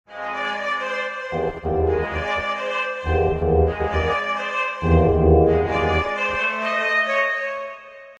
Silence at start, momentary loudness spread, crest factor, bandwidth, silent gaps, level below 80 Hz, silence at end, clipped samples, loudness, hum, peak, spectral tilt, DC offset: 0.1 s; 9 LU; 16 dB; 8 kHz; none; -30 dBFS; 0.05 s; under 0.1%; -21 LUFS; none; -4 dBFS; -7 dB/octave; under 0.1%